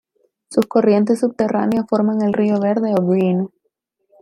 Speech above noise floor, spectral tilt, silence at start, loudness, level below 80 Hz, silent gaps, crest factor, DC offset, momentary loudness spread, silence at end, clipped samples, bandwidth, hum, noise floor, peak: 55 dB; -8 dB/octave; 0.5 s; -17 LUFS; -62 dBFS; none; 16 dB; under 0.1%; 5 LU; 0.75 s; under 0.1%; 12 kHz; none; -71 dBFS; -2 dBFS